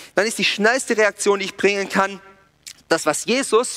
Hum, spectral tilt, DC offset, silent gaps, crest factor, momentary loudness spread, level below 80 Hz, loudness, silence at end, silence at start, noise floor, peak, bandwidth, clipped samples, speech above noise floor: none; -2.5 dB/octave; under 0.1%; none; 18 dB; 4 LU; -64 dBFS; -19 LUFS; 0 s; 0 s; -44 dBFS; -2 dBFS; 16 kHz; under 0.1%; 25 dB